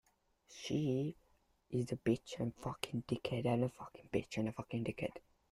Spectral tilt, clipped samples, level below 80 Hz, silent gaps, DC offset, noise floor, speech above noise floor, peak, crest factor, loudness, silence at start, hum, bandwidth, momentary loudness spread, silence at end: -6.5 dB/octave; under 0.1%; -68 dBFS; none; under 0.1%; -73 dBFS; 34 dB; -18 dBFS; 22 dB; -40 LUFS; 0.5 s; none; 13 kHz; 8 LU; 0.35 s